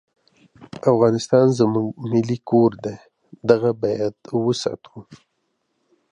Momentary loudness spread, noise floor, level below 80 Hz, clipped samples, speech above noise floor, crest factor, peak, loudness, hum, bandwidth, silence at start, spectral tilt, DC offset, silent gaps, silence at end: 14 LU; -72 dBFS; -62 dBFS; under 0.1%; 53 dB; 20 dB; -2 dBFS; -20 LUFS; none; 10.5 kHz; 0.6 s; -7 dB/octave; under 0.1%; none; 0.95 s